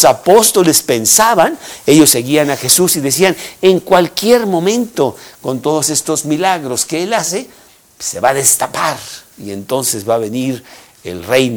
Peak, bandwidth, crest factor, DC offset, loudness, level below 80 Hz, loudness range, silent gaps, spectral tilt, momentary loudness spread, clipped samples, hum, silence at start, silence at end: 0 dBFS; over 20 kHz; 14 dB; under 0.1%; -12 LUFS; -52 dBFS; 6 LU; none; -3 dB/octave; 15 LU; 0.7%; none; 0 s; 0 s